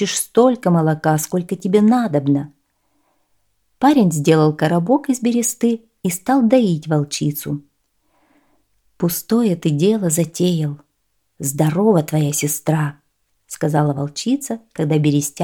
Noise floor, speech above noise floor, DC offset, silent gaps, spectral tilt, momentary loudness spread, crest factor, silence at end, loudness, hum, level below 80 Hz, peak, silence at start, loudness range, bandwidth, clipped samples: -69 dBFS; 52 dB; under 0.1%; none; -6 dB/octave; 9 LU; 16 dB; 0 s; -18 LUFS; none; -60 dBFS; -2 dBFS; 0 s; 4 LU; 18.5 kHz; under 0.1%